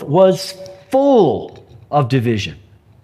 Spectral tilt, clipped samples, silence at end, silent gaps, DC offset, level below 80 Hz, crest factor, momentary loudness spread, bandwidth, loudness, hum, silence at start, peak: -7 dB/octave; under 0.1%; 0.5 s; none; under 0.1%; -52 dBFS; 16 dB; 15 LU; 14.5 kHz; -15 LUFS; none; 0 s; 0 dBFS